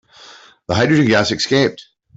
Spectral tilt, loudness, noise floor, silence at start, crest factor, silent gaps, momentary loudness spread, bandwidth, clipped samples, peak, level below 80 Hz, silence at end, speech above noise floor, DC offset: -5 dB/octave; -15 LUFS; -43 dBFS; 0.7 s; 14 dB; none; 8 LU; 8 kHz; under 0.1%; -2 dBFS; -52 dBFS; 0.35 s; 28 dB; under 0.1%